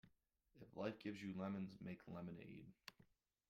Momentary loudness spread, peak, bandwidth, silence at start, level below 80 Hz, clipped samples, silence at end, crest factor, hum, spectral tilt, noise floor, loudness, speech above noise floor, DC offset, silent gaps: 14 LU; -32 dBFS; 15.5 kHz; 0.05 s; -82 dBFS; under 0.1%; 0.45 s; 20 dB; none; -7 dB/octave; -80 dBFS; -52 LUFS; 29 dB; under 0.1%; none